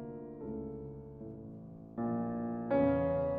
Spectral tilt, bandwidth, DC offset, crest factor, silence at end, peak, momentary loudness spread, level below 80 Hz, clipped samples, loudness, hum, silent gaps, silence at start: -9 dB/octave; 4.6 kHz; under 0.1%; 16 dB; 0 s; -20 dBFS; 18 LU; -58 dBFS; under 0.1%; -36 LUFS; none; none; 0 s